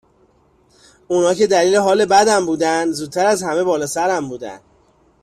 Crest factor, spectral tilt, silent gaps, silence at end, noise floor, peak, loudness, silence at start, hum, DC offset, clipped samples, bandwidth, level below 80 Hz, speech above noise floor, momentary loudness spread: 16 dB; -3.5 dB/octave; none; 0.65 s; -56 dBFS; -2 dBFS; -16 LUFS; 1.1 s; none; under 0.1%; under 0.1%; 14.5 kHz; -58 dBFS; 40 dB; 9 LU